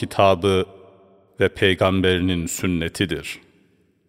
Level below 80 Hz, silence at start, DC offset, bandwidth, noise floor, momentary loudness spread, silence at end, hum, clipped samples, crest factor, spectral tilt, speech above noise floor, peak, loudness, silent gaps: -46 dBFS; 0 s; under 0.1%; 16 kHz; -60 dBFS; 12 LU; 0.7 s; none; under 0.1%; 20 dB; -5 dB/octave; 40 dB; -2 dBFS; -20 LUFS; none